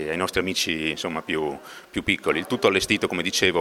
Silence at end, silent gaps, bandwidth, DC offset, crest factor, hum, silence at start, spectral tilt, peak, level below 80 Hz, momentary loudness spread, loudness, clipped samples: 0 s; none; 17.5 kHz; under 0.1%; 20 dB; none; 0 s; -3 dB/octave; -4 dBFS; -50 dBFS; 8 LU; -24 LUFS; under 0.1%